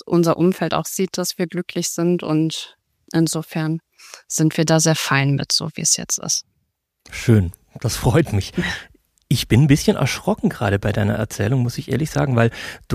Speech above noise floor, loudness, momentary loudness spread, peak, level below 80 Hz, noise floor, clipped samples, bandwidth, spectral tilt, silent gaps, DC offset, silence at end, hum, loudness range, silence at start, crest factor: 52 dB; -19 LUFS; 9 LU; 0 dBFS; -42 dBFS; -71 dBFS; under 0.1%; 15.5 kHz; -4.5 dB/octave; none; under 0.1%; 0 s; none; 3 LU; 0.05 s; 18 dB